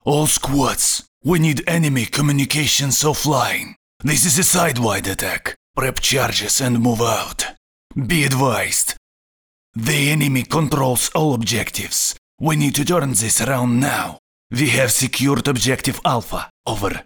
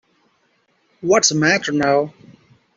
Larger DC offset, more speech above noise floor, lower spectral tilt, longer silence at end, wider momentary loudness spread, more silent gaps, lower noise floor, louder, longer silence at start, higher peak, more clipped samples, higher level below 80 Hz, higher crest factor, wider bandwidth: neither; first, over 72 dB vs 46 dB; about the same, -3.5 dB/octave vs -3 dB/octave; second, 0.05 s vs 0.65 s; second, 9 LU vs 12 LU; first, 1.08-1.21 s, 3.76-4.00 s, 5.56-5.74 s, 7.57-7.90 s, 8.97-9.74 s, 12.18-12.38 s, 14.19-14.50 s, 16.50-16.64 s vs none; first, under -90 dBFS vs -63 dBFS; about the same, -17 LUFS vs -16 LUFS; second, 0.05 s vs 1.05 s; about the same, -4 dBFS vs -2 dBFS; neither; first, -40 dBFS vs -60 dBFS; about the same, 16 dB vs 18 dB; first, over 20 kHz vs 8 kHz